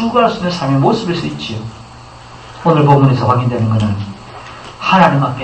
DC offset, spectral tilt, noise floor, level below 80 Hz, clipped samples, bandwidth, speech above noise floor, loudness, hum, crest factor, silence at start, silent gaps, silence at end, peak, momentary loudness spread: under 0.1%; -7.5 dB/octave; -35 dBFS; -44 dBFS; under 0.1%; 8.6 kHz; 23 dB; -13 LUFS; none; 14 dB; 0 s; none; 0 s; 0 dBFS; 21 LU